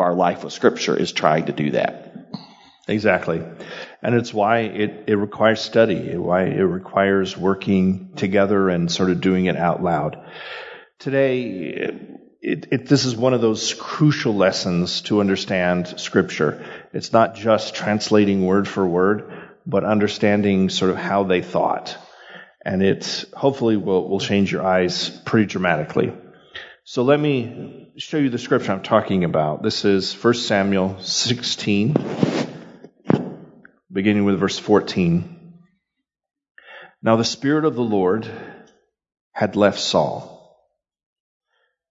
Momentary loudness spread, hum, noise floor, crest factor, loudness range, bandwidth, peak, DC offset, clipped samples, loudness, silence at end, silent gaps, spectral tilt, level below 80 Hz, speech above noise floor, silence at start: 14 LU; none; -80 dBFS; 20 dB; 3 LU; 7.8 kHz; 0 dBFS; under 0.1%; under 0.1%; -20 LUFS; 1.55 s; 36.51-36.55 s, 39.21-39.31 s; -5.5 dB/octave; -62 dBFS; 61 dB; 0 s